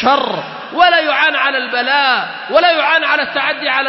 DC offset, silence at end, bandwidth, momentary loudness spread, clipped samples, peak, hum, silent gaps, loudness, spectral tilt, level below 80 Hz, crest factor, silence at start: under 0.1%; 0 s; 6 kHz; 6 LU; under 0.1%; 0 dBFS; none; none; -13 LUFS; -4 dB/octave; -58 dBFS; 14 dB; 0 s